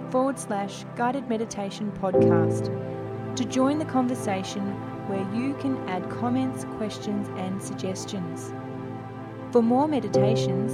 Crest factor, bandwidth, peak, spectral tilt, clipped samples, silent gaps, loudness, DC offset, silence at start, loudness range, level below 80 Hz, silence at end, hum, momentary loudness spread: 18 dB; 13.5 kHz; -8 dBFS; -6.5 dB/octave; under 0.1%; none; -27 LUFS; under 0.1%; 0 s; 5 LU; -58 dBFS; 0 s; none; 12 LU